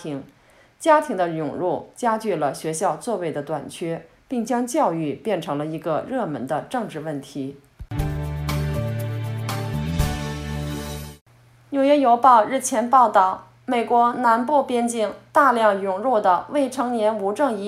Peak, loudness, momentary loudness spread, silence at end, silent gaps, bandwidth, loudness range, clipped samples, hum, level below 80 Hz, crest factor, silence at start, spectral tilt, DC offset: -2 dBFS; -22 LUFS; 13 LU; 0 s; 11.21-11.26 s; 16 kHz; 9 LU; under 0.1%; none; -42 dBFS; 20 dB; 0 s; -5.5 dB/octave; under 0.1%